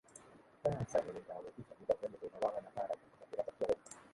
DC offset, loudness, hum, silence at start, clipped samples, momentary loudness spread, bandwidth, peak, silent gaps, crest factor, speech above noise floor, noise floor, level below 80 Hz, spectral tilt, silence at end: under 0.1%; -41 LUFS; none; 0.15 s; under 0.1%; 11 LU; 11.5 kHz; -20 dBFS; none; 22 dB; 20 dB; -61 dBFS; -68 dBFS; -6 dB/octave; 0.05 s